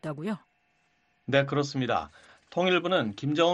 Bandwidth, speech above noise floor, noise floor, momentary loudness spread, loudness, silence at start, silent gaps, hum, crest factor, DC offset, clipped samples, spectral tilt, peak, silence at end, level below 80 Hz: 10.5 kHz; 43 dB; -70 dBFS; 12 LU; -28 LUFS; 0.05 s; none; none; 20 dB; under 0.1%; under 0.1%; -5.5 dB/octave; -8 dBFS; 0 s; -66 dBFS